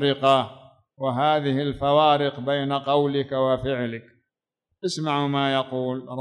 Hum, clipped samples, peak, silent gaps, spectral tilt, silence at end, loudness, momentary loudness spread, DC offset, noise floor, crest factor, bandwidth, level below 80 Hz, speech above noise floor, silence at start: none; under 0.1%; -6 dBFS; none; -6 dB/octave; 0 s; -23 LUFS; 11 LU; under 0.1%; -83 dBFS; 18 dB; 11 kHz; -56 dBFS; 61 dB; 0 s